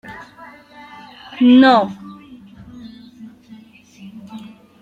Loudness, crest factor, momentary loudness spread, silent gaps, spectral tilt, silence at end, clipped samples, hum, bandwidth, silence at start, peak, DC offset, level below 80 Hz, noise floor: -12 LUFS; 18 dB; 29 LU; none; -6 dB/octave; 0.45 s; under 0.1%; none; 6.6 kHz; 0.1 s; -2 dBFS; under 0.1%; -60 dBFS; -43 dBFS